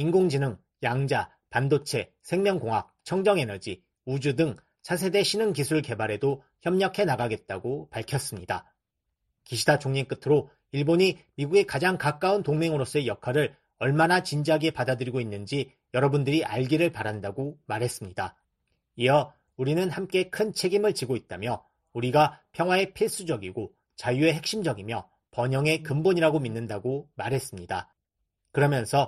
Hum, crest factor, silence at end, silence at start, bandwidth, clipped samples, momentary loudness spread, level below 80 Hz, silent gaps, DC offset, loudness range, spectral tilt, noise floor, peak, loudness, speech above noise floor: none; 20 dB; 0 s; 0 s; 13 kHz; under 0.1%; 10 LU; -62 dBFS; none; under 0.1%; 3 LU; -5.5 dB/octave; -81 dBFS; -8 dBFS; -27 LUFS; 55 dB